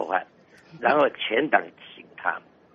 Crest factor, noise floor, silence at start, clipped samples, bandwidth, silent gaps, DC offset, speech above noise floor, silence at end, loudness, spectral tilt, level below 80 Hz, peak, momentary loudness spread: 22 dB; -54 dBFS; 0 s; under 0.1%; 6.8 kHz; none; under 0.1%; 30 dB; 0.35 s; -24 LUFS; -1 dB/octave; -72 dBFS; -4 dBFS; 21 LU